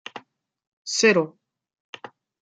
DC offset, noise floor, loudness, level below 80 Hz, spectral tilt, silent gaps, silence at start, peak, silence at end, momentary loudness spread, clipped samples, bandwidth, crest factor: under 0.1%; -55 dBFS; -21 LUFS; -78 dBFS; -3 dB/octave; 0.67-0.85 s, 1.80-1.93 s; 0.15 s; -4 dBFS; 0.35 s; 25 LU; under 0.1%; 9.6 kHz; 22 dB